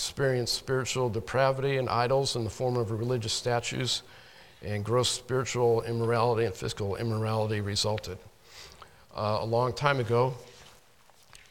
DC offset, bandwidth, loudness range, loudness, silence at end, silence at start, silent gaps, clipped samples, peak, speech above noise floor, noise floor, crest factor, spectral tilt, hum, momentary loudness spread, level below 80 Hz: under 0.1%; 16.5 kHz; 3 LU; -29 LUFS; 0.8 s; 0 s; none; under 0.1%; -8 dBFS; 32 dB; -61 dBFS; 22 dB; -4.5 dB/octave; none; 10 LU; -56 dBFS